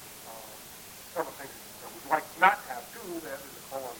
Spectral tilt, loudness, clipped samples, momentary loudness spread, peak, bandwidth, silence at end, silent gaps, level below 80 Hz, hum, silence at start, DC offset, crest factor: -2.5 dB/octave; -31 LUFS; under 0.1%; 19 LU; -6 dBFS; over 20 kHz; 0 s; none; -68 dBFS; none; 0 s; under 0.1%; 28 dB